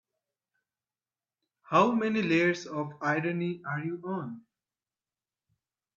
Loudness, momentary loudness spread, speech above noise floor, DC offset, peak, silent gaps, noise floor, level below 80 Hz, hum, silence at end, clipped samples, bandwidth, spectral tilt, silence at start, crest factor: -29 LUFS; 12 LU; over 61 dB; under 0.1%; -8 dBFS; none; under -90 dBFS; -76 dBFS; none; 1.55 s; under 0.1%; 7.4 kHz; -6.5 dB/octave; 1.7 s; 24 dB